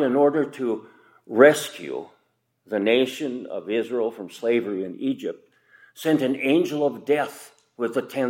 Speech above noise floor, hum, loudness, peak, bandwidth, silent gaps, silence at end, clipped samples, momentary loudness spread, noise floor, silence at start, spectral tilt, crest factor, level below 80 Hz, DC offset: 46 dB; none; -23 LUFS; 0 dBFS; 16.5 kHz; none; 0 s; under 0.1%; 15 LU; -69 dBFS; 0 s; -5 dB/octave; 22 dB; -78 dBFS; under 0.1%